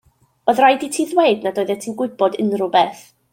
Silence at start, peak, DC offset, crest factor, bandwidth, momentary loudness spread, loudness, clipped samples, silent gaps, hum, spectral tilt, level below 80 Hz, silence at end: 0.45 s; -2 dBFS; under 0.1%; 16 dB; 17 kHz; 9 LU; -18 LUFS; under 0.1%; none; none; -4 dB/octave; -66 dBFS; 0.35 s